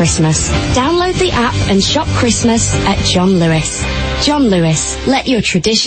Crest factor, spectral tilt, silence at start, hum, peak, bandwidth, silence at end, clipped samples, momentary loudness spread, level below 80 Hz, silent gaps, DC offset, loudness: 12 dB; -4 dB/octave; 0 s; none; 0 dBFS; 8.8 kHz; 0 s; under 0.1%; 3 LU; -26 dBFS; none; under 0.1%; -12 LUFS